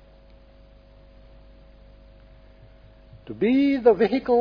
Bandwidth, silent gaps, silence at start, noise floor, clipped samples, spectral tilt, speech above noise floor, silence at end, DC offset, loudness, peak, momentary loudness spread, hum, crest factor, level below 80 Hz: 5.2 kHz; none; 3.25 s; -51 dBFS; under 0.1%; -8.5 dB/octave; 31 dB; 0 s; under 0.1%; -20 LUFS; -6 dBFS; 8 LU; 50 Hz at -50 dBFS; 20 dB; -52 dBFS